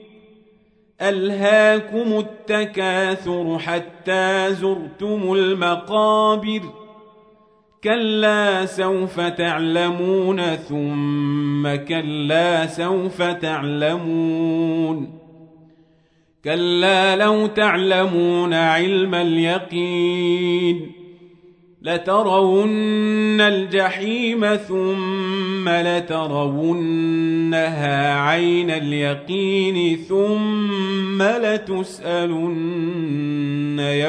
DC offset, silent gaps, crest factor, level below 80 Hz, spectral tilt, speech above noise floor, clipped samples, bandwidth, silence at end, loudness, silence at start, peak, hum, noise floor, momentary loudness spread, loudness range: under 0.1%; none; 16 dB; -64 dBFS; -6 dB/octave; 40 dB; under 0.1%; 10.5 kHz; 0 s; -19 LUFS; 1 s; -2 dBFS; none; -59 dBFS; 7 LU; 3 LU